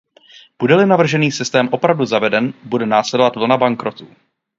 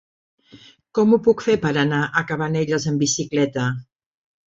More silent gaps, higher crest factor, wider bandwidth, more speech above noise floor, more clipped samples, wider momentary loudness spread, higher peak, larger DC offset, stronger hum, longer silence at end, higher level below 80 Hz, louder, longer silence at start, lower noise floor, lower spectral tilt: neither; about the same, 16 dB vs 18 dB; about the same, 7.8 kHz vs 7.8 kHz; about the same, 31 dB vs 29 dB; neither; about the same, 8 LU vs 8 LU; first, 0 dBFS vs -4 dBFS; neither; neither; second, 0.55 s vs 0.7 s; second, -62 dBFS vs -56 dBFS; first, -15 LUFS vs -20 LUFS; about the same, 0.6 s vs 0.55 s; about the same, -46 dBFS vs -49 dBFS; about the same, -5.5 dB/octave vs -5 dB/octave